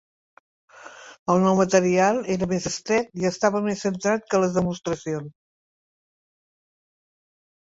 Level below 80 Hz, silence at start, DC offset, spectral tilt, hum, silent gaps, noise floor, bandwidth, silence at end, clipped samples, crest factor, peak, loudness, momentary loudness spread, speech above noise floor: -58 dBFS; 0.8 s; under 0.1%; -5.5 dB/octave; none; 1.19-1.26 s; -44 dBFS; 8 kHz; 2.45 s; under 0.1%; 20 dB; -4 dBFS; -23 LUFS; 13 LU; 22 dB